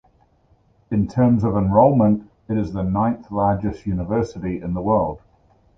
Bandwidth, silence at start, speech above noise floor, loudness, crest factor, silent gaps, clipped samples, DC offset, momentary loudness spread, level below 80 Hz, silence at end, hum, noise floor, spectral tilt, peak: 7.6 kHz; 0.9 s; 40 dB; -20 LUFS; 18 dB; none; under 0.1%; under 0.1%; 11 LU; -40 dBFS; 0.6 s; none; -58 dBFS; -10.5 dB/octave; -2 dBFS